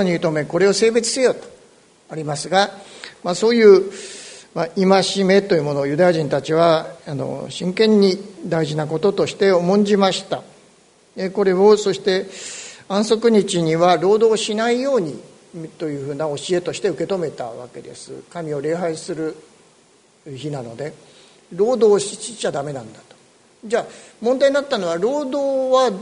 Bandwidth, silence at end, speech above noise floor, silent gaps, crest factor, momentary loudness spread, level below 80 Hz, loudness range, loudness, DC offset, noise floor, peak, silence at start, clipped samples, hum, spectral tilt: 11 kHz; 0 s; 36 dB; none; 18 dB; 17 LU; -62 dBFS; 9 LU; -18 LUFS; under 0.1%; -54 dBFS; 0 dBFS; 0 s; under 0.1%; none; -5 dB/octave